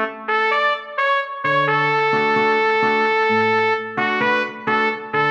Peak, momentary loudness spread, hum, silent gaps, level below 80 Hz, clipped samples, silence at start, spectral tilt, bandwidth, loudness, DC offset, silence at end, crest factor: -6 dBFS; 4 LU; none; none; -68 dBFS; under 0.1%; 0 s; -5.5 dB/octave; 7.6 kHz; -18 LUFS; under 0.1%; 0 s; 14 dB